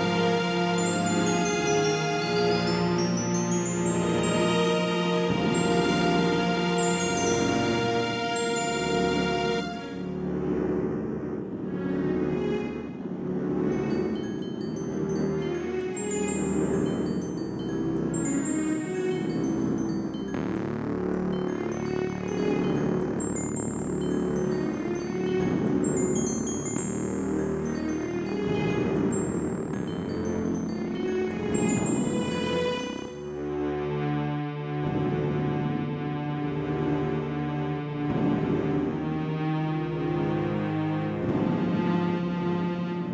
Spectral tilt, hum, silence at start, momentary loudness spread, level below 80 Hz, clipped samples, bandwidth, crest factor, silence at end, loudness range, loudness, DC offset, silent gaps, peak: -5.5 dB/octave; none; 0 s; 6 LU; -50 dBFS; under 0.1%; 8 kHz; 16 dB; 0 s; 5 LU; -27 LUFS; under 0.1%; none; -12 dBFS